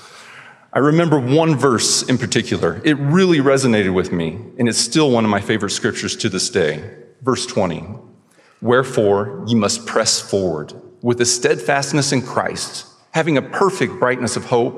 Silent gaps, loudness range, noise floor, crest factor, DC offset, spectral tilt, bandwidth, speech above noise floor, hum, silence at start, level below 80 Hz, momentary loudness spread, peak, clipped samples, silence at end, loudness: none; 4 LU; -51 dBFS; 18 dB; under 0.1%; -4.5 dB/octave; 13.5 kHz; 34 dB; none; 0 s; -60 dBFS; 9 LU; 0 dBFS; under 0.1%; 0 s; -17 LUFS